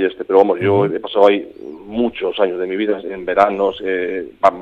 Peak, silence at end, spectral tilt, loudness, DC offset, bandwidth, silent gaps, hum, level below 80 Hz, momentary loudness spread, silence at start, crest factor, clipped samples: 0 dBFS; 0 s; -7.5 dB/octave; -17 LUFS; under 0.1%; 7.2 kHz; none; none; -54 dBFS; 9 LU; 0 s; 16 dB; under 0.1%